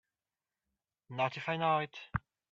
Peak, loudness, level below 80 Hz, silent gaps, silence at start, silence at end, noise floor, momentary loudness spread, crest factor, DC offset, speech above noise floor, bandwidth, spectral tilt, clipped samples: -18 dBFS; -35 LUFS; -62 dBFS; none; 1.1 s; 0.3 s; under -90 dBFS; 10 LU; 20 dB; under 0.1%; over 56 dB; 7.6 kHz; -6.5 dB/octave; under 0.1%